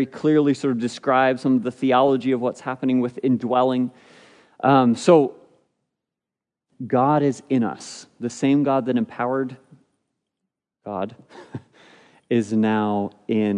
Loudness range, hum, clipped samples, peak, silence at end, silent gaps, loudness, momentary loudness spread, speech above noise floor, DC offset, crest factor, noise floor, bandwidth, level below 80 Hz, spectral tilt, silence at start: 7 LU; none; under 0.1%; -2 dBFS; 0 s; none; -21 LUFS; 14 LU; 67 dB; under 0.1%; 20 dB; -87 dBFS; 10.5 kHz; -72 dBFS; -6.5 dB/octave; 0 s